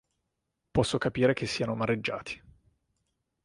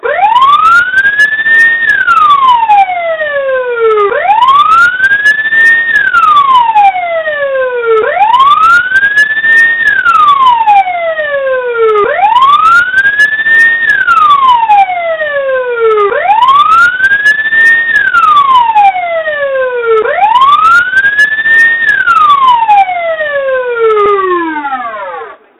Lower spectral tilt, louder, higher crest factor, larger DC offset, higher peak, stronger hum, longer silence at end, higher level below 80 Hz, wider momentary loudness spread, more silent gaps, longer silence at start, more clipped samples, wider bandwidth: first, -5.5 dB/octave vs -2.5 dB/octave; second, -29 LUFS vs -6 LUFS; first, 22 dB vs 6 dB; neither; second, -10 dBFS vs 0 dBFS; neither; first, 1.05 s vs 0.25 s; second, -54 dBFS vs -46 dBFS; first, 12 LU vs 8 LU; neither; first, 0.75 s vs 0.05 s; second, under 0.1% vs 1%; second, 11.5 kHz vs 16 kHz